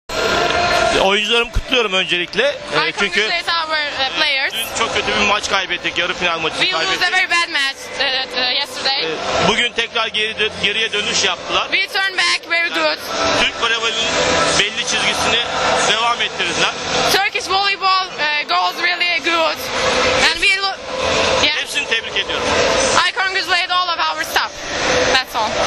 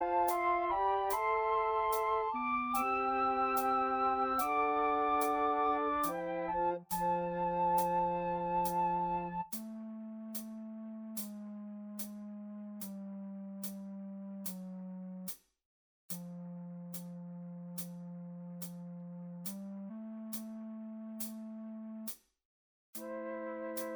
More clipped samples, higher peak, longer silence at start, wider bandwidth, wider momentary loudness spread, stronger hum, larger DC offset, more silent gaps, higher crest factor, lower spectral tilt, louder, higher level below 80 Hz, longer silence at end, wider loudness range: neither; first, 0 dBFS vs -20 dBFS; about the same, 0.1 s vs 0 s; second, 14 kHz vs over 20 kHz; second, 4 LU vs 15 LU; neither; neither; second, none vs 15.65-16.09 s, 22.45-22.93 s; about the same, 18 dB vs 16 dB; second, -1.5 dB/octave vs -5 dB/octave; first, -16 LUFS vs -36 LUFS; first, -40 dBFS vs -64 dBFS; about the same, 0 s vs 0 s; second, 1 LU vs 13 LU